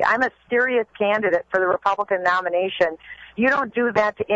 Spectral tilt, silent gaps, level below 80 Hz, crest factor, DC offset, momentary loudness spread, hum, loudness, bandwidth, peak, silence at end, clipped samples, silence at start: -5.5 dB/octave; none; -60 dBFS; 14 dB; under 0.1%; 4 LU; none; -21 LUFS; 7.8 kHz; -6 dBFS; 0 s; under 0.1%; 0 s